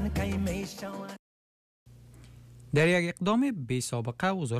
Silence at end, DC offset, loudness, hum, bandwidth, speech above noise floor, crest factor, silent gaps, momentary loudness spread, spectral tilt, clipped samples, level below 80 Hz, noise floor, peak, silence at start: 0 s; under 0.1%; -29 LUFS; none; 15 kHz; 23 dB; 16 dB; 1.19-1.86 s; 15 LU; -5.5 dB/octave; under 0.1%; -48 dBFS; -51 dBFS; -16 dBFS; 0 s